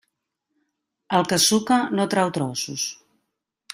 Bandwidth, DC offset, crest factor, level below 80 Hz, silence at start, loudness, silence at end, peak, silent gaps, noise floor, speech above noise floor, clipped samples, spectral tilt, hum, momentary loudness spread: 15.5 kHz; under 0.1%; 18 dB; -64 dBFS; 1.1 s; -21 LUFS; 0.8 s; -6 dBFS; none; -79 dBFS; 57 dB; under 0.1%; -3.5 dB/octave; none; 9 LU